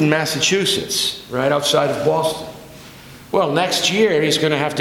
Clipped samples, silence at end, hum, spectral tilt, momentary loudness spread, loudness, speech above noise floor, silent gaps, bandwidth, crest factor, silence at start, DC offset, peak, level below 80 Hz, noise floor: under 0.1%; 0 s; none; -3.5 dB/octave; 7 LU; -17 LUFS; 22 dB; none; 19 kHz; 16 dB; 0 s; under 0.1%; -2 dBFS; -52 dBFS; -39 dBFS